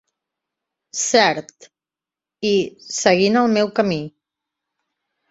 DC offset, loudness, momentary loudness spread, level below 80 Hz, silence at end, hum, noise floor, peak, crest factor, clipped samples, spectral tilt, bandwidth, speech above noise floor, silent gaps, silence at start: under 0.1%; -18 LUFS; 12 LU; -62 dBFS; 1.2 s; none; -89 dBFS; -2 dBFS; 20 dB; under 0.1%; -3.5 dB/octave; 8.2 kHz; 71 dB; none; 0.95 s